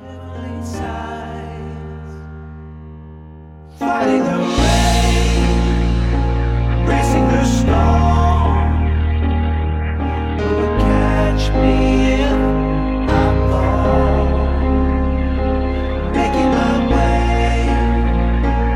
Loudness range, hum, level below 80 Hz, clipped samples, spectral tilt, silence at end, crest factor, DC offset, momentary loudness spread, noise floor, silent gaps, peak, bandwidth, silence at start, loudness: 7 LU; none; -18 dBFS; under 0.1%; -6.5 dB/octave; 0 s; 14 dB; under 0.1%; 15 LU; -37 dBFS; none; -2 dBFS; 12 kHz; 0 s; -16 LUFS